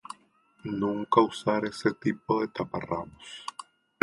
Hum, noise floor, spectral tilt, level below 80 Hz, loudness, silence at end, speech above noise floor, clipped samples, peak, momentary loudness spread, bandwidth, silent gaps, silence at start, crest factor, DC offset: none; -63 dBFS; -6 dB/octave; -62 dBFS; -29 LUFS; 0.4 s; 35 dB; under 0.1%; -6 dBFS; 18 LU; 11.5 kHz; none; 0.65 s; 24 dB; under 0.1%